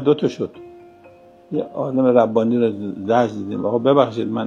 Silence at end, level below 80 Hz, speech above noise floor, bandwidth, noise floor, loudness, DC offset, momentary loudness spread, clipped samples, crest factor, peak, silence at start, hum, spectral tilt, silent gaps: 0 s; -66 dBFS; 28 dB; 7.4 kHz; -46 dBFS; -19 LUFS; under 0.1%; 12 LU; under 0.1%; 18 dB; -2 dBFS; 0 s; none; -8 dB/octave; none